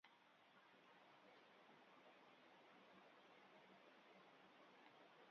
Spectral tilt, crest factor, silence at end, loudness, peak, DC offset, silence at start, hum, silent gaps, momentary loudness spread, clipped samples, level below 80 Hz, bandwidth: -1.5 dB/octave; 20 dB; 0 s; -69 LUFS; -50 dBFS; under 0.1%; 0.05 s; none; none; 1 LU; under 0.1%; under -90 dBFS; 6.4 kHz